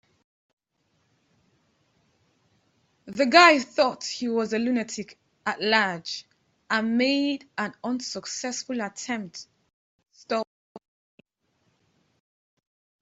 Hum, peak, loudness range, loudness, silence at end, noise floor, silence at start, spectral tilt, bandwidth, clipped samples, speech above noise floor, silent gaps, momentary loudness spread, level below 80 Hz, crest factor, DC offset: none; -2 dBFS; 14 LU; -24 LUFS; 2.25 s; -72 dBFS; 3.05 s; -3 dB/octave; 8 kHz; under 0.1%; 48 dB; 9.73-9.99 s, 10.47-10.75 s; 17 LU; -74 dBFS; 26 dB; under 0.1%